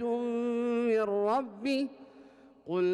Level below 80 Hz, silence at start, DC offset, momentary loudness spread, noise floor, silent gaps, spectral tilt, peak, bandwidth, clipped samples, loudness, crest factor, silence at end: -78 dBFS; 0 s; under 0.1%; 7 LU; -56 dBFS; none; -6.5 dB/octave; -20 dBFS; 11 kHz; under 0.1%; -31 LUFS; 10 dB; 0 s